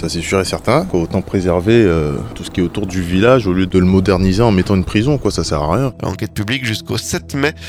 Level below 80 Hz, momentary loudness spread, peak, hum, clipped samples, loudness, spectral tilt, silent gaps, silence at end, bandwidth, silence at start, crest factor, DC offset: -32 dBFS; 9 LU; 0 dBFS; none; under 0.1%; -15 LUFS; -6 dB/octave; none; 0 s; 15.5 kHz; 0 s; 14 dB; under 0.1%